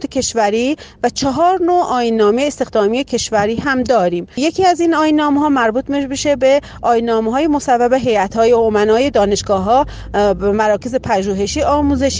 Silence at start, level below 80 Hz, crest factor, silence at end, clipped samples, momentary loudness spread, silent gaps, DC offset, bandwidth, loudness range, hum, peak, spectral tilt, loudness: 0 s; -36 dBFS; 12 dB; 0 s; under 0.1%; 5 LU; none; under 0.1%; 10 kHz; 1 LU; none; -2 dBFS; -4.5 dB/octave; -15 LUFS